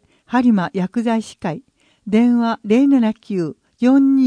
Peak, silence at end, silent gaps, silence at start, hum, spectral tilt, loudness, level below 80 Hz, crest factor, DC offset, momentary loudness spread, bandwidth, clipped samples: -4 dBFS; 0 s; none; 0.3 s; none; -7.5 dB/octave; -17 LUFS; -60 dBFS; 12 dB; under 0.1%; 13 LU; 10 kHz; under 0.1%